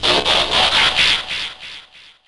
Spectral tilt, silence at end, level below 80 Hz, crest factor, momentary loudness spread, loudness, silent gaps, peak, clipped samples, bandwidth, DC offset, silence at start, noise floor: -1.5 dB/octave; 0.15 s; -42 dBFS; 14 dB; 17 LU; -14 LUFS; none; -4 dBFS; under 0.1%; 11.5 kHz; under 0.1%; 0 s; -43 dBFS